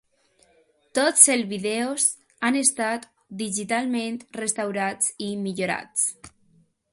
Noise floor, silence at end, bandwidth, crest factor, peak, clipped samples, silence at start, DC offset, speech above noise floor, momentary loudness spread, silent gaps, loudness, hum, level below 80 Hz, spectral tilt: -63 dBFS; 0.65 s; 12 kHz; 26 dB; 0 dBFS; under 0.1%; 0.95 s; under 0.1%; 39 dB; 14 LU; none; -23 LUFS; none; -70 dBFS; -2 dB/octave